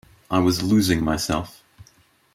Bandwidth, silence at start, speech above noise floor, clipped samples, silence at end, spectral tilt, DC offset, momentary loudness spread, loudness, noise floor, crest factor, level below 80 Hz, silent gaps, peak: 16 kHz; 0.3 s; 37 dB; under 0.1%; 0.85 s; -5 dB/octave; under 0.1%; 8 LU; -21 LUFS; -58 dBFS; 18 dB; -44 dBFS; none; -6 dBFS